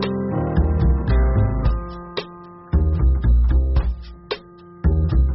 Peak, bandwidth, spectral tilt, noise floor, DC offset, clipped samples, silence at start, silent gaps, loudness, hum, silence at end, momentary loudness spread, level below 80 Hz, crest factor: -8 dBFS; 5.8 kHz; -7.5 dB/octave; -41 dBFS; under 0.1%; under 0.1%; 0 s; none; -21 LUFS; none; 0 s; 13 LU; -20 dBFS; 12 dB